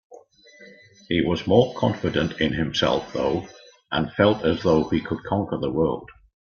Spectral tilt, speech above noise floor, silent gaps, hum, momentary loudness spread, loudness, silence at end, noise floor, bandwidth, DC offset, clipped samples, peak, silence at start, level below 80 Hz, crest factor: -6.5 dB/octave; 28 dB; none; none; 7 LU; -23 LUFS; 0.35 s; -50 dBFS; 7 kHz; under 0.1%; under 0.1%; -2 dBFS; 0.1 s; -48 dBFS; 22 dB